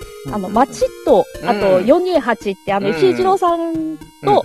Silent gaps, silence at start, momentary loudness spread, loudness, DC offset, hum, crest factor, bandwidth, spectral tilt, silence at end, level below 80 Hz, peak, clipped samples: none; 0 s; 9 LU; -16 LUFS; 0.2%; none; 16 dB; 13.5 kHz; -5.5 dB/octave; 0 s; -44 dBFS; 0 dBFS; under 0.1%